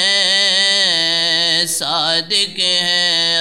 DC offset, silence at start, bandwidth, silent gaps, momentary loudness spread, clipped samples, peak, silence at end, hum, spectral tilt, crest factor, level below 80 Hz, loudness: 0.4%; 0 s; 16 kHz; none; 4 LU; under 0.1%; -2 dBFS; 0 s; none; -0.5 dB/octave; 14 dB; -64 dBFS; -13 LUFS